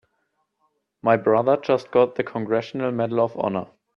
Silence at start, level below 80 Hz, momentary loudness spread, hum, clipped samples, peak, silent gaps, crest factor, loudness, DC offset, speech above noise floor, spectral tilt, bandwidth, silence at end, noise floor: 1.05 s; -66 dBFS; 8 LU; none; under 0.1%; -4 dBFS; none; 18 dB; -22 LUFS; under 0.1%; 51 dB; -8 dB/octave; 7 kHz; 0.35 s; -73 dBFS